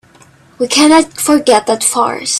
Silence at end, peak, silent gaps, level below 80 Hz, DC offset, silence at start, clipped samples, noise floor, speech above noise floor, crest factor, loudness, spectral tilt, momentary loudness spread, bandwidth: 0 s; 0 dBFS; none; -52 dBFS; under 0.1%; 0.6 s; under 0.1%; -44 dBFS; 33 dB; 12 dB; -11 LUFS; -2 dB/octave; 6 LU; 14 kHz